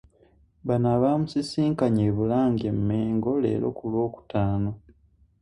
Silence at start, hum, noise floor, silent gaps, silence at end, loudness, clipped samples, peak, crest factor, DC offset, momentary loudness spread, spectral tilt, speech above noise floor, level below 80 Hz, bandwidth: 0.65 s; none; -60 dBFS; none; 0.65 s; -25 LUFS; under 0.1%; -10 dBFS; 16 dB; under 0.1%; 6 LU; -8.5 dB/octave; 36 dB; -50 dBFS; 11 kHz